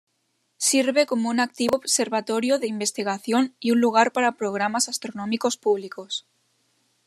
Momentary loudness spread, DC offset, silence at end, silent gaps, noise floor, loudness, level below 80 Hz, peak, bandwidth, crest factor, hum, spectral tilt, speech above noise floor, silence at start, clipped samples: 9 LU; under 0.1%; 0.85 s; none; -72 dBFS; -23 LUFS; -72 dBFS; -4 dBFS; 13.5 kHz; 20 dB; none; -2.5 dB/octave; 49 dB; 0.6 s; under 0.1%